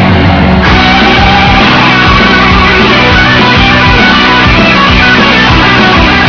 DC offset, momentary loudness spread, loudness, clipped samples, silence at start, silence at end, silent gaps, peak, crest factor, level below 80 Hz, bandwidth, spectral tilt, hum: under 0.1%; 1 LU; -3 LUFS; 10%; 0 s; 0 s; none; 0 dBFS; 4 dB; -16 dBFS; 5.4 kHz; -5.5 dB/octave; none